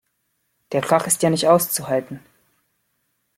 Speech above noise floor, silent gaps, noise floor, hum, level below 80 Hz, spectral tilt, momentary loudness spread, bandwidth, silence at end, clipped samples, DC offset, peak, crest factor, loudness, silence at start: 52 dB; none; -71 dBFS; none; -64 dBFS; -4 dB/octave; 13 LU; 16.5 kHz; 1.2 s; under 0.1%; under 0.1%; -2 dBFS; 20 dB; -19 LUFS; 0.7 s